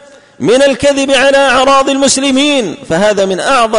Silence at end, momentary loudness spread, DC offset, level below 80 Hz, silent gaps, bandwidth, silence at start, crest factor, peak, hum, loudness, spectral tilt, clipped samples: 0 s; 5 LU; under 0.1%; -40 dBFS; none; 11 kHz; 0.4 s; 10 dB; 0 dBFS; none; -9 LUFS; -3 dB/octave; under 0.1%